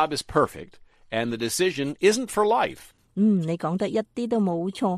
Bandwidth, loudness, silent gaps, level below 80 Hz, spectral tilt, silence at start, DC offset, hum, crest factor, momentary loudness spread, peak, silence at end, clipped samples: 15 kHz; -24 LUFS; none; -56 dBFS; -5 dB/octave; 0 s; under 0.1%; none; 18 dB; 7 LU; -6 dBFS; 0 s; under 0.1%